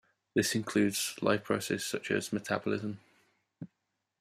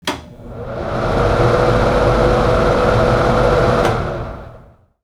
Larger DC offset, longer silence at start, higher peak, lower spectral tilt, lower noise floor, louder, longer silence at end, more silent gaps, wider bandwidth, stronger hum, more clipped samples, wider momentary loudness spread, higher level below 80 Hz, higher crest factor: neither; first, 0.35 s vs 0.05 s; second, -14 dBFS vs 0 dBFS; second, -4 dB/octave vs -6.5 dB/octave; first, -83 dBFS vs -43 dBFS; second, -32 LUFS vs -15 LUFS; about the same, 0.55 s vs 0.45 s; neither; about the same, 15 kHz vs 14 kHz; neither; neither; first, 20 LU vs 15 LU; second, -72 dBFS vs -26 dBFS; first, 20 dB vs 14 dB